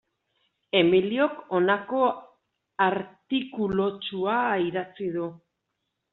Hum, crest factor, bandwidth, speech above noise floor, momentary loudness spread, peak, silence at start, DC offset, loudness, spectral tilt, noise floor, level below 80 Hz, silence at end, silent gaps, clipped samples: none; 20 dB; 4.1 kHz; 55 dB; 11 LU; -6 dBFS; 0.75 s; under 0.1%; -26 LUFS; -3.5 dB/octave; -80 dBFS; -64 dBFS; 0.75 s; none; under 0.1%